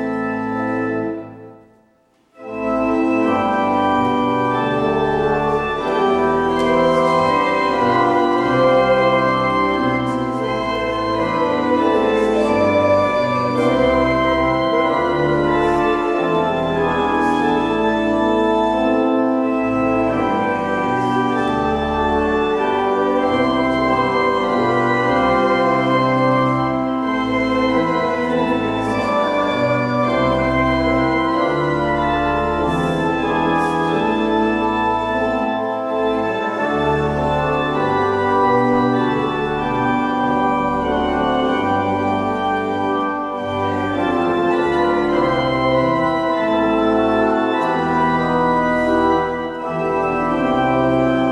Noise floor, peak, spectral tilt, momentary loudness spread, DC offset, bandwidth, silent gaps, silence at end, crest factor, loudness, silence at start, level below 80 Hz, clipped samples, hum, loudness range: -57 dBFS; -4 dBFS; -7 dB/octave; 4 LU; under 0.1%; 11 kHz; none; 0 s; 14 dB; -17 LUFS; 0 s; -40 dBFS; under 0.1%; none; 3 LU